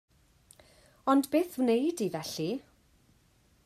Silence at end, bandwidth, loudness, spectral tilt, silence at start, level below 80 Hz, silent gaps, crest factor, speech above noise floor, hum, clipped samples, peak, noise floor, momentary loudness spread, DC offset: 1.05 s; 15.5 kHz; -30 LUFS; -5 dB/octave; 1.05 s; -70 dBFS; none; 20 dB; 37 dB; none; under 0.1%; -12 dBFS; -66 dBFS; 10 LU; under 0.1%